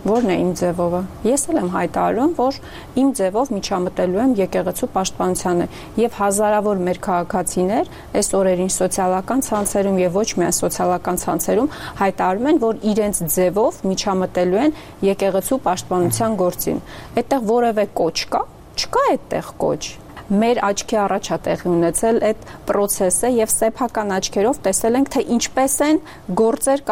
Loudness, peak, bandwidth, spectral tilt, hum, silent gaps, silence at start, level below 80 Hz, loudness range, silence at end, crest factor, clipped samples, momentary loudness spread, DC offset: -19 LUFS; -4 dBFS; 16 kHz; -4.5 dB/octave; none; none; 0 s; -44 dBFS; 2 LU; 0 s; 14 dB; under 0.1%; 5 LU; 0.2%